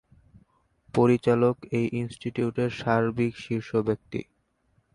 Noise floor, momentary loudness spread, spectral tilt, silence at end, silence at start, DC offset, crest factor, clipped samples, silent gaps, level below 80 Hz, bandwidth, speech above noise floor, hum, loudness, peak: -69 dBFS; 10 LU; -8 dB/octave; 0.7 s; 0.95 s; under 0.1%; 18 dB; under 0.1%; none; -58 dBFS; 11 kHz; 44 dB; none; -26 LUFS; -8 dBFS